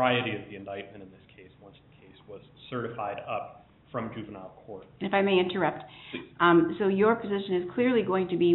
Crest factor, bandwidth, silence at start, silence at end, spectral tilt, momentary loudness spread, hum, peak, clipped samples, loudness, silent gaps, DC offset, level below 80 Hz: 18 dB; 4.2 kHz; 0 s; 0 s; -4.5 dB/octave; 22 LU; none; -10 dBFS; under 0.1%; -27 LUFS; none; under 0.1%; -66 dBFS